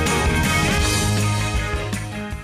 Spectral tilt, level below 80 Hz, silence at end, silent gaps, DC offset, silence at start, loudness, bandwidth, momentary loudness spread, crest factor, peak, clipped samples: -4 dB/octave; -28 dBFS; 0 s; none; under 0.1%; 0 s; -20 LUFS; 15.5 kHz; 9 LU; 14 dB; -8 dBFS; under 0.1%